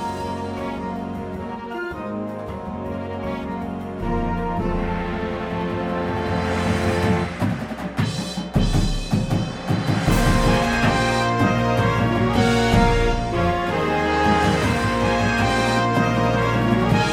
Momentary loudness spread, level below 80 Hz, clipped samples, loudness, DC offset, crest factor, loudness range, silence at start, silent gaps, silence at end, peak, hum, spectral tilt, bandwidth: 11 LU; -30 dBFS; under 0.1%; -21 LUFS; under 0.1%; 20 dB; 9 LU; 0 s; none; 0 s; -2 dBFS; none; -6 dB/octave; 16.5 kHz